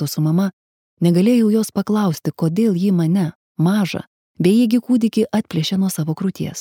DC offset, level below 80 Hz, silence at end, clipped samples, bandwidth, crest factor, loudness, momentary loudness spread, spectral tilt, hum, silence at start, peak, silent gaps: under 0.1%; -62 dBFS; 0 s; under 0.1%; 17 kHz; 16 dB; -18 LUFS; 8 LU; -6.5 dB/octave; none; 0 s; -2 dBFS; 0.53-0.97 s, 3.35-3.55 s, 4.07-4.35 s